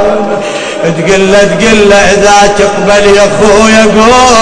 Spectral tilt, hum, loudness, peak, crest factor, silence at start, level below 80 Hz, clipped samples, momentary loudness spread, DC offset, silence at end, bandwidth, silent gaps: -3.5 dB/octave; none; -5 LUFS; 0 dBFS; 4 dB; 0 s; -26 dBFS; 10%; 8 LU; under 0.1%; 0 s; 11 kHz; none